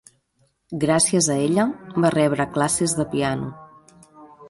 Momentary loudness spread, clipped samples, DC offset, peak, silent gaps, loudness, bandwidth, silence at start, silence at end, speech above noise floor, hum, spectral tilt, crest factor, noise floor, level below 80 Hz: 8 LU; under 0.1%; under 0.1%; -4 dBFS; none; -21 LUFS; 12 kHz; 0.7 s; 0 s; 45 dB; none; -4.5 dB/octave; 18 dB; -66 dBFS; -54 dBFS